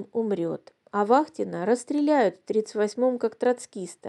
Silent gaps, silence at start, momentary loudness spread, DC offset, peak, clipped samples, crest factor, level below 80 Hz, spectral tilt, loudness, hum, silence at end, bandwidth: none; 0 s; 9 LU; under 0.1%; -6 dBFS; under 0.1%; 20 dB; -82 dBFS; -5.5 dB/octave; -25 LUFS; none; 0 s; 11.5 kHz